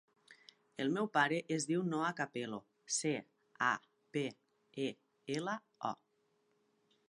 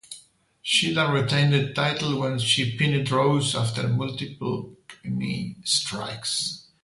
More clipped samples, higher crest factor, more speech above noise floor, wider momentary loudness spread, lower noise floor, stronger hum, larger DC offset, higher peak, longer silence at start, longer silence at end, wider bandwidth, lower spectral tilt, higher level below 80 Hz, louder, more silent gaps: neither; first, 24 dB vs 18 dB; first, 41 dB vs 29 dB; about the same, 11 LU vs 11 LU; first, -78 dBFS vs -54 dBFS; neither; neither; second, -16 dBFS vs -6 dBFS; first, 0.3 s vs 0.1 s; first, 1.15 s vs 0.2 s; about the same, 11.5 kHz vs 11.5 kHz; about the same, -4 dB/octave vs -4 dB/octave; second, -88 dBFS vs -58 dBFS; second, -38 LUFS vs -24 LUFS; neither